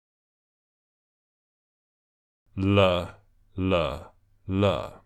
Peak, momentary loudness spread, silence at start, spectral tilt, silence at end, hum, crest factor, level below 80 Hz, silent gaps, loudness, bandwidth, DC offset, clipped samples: -8 dBFS; 19 LU; 2.55 s; -7.5 dB/octave; 0.1 s; none; 22 dB; -54 dBFS; none; -25 LUFS; 8.8 kHz; under 0.1%; under 0.1%